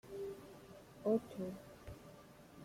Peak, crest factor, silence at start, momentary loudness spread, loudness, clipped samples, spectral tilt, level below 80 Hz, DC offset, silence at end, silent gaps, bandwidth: -24 dBFS; 20 dB; 0.05 s; 21 LU; -42 LUFS; under 0.1%; -7 dB/octave; -68 dBFS; under 0.1%; 0 s; none; 16.5 kHz